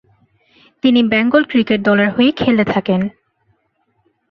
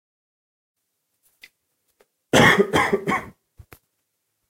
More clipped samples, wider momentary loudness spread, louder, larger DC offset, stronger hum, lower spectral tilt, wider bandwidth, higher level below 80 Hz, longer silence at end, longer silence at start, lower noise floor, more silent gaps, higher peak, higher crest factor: neither; second, 6 LU vs 11 LU; first, -14 LUFS vs -18 LUFS; neither; neither; first, -8 dB/octave vs -4 dB/octave; second, 6 kHz vs 16 kHz; about the same, -52 dBFS vs -50 dBFS; about the same, 1.2 s vs 1.2 s; second, 0.85 s vs 2.35 s; second, -64 dBFS vs -76 dBFS; neither; about the same, -2 dBFS vs 0 dBFS; second, 14 dB vs 24 dB